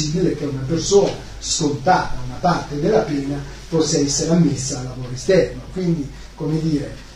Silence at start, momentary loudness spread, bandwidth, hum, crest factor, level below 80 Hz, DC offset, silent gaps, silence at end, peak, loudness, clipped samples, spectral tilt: 0 s; 11 LU; 11.5 kHz; none; 18 dB; -36 dBFS; under 0.1%; none; 0 s; -2 dBFS; -20 LUFS; under 0.1%; -5 dB/octave